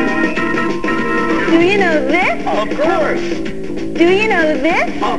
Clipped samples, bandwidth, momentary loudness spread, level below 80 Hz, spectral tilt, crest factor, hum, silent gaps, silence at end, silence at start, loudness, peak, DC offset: under 0.1%; 11 kHz; 8 LU; -38 dBFS; -5.5 dB/octave; 14 dB; none; none; 0 s; 0 s; -14 LUFS; 0 dBFS; 7%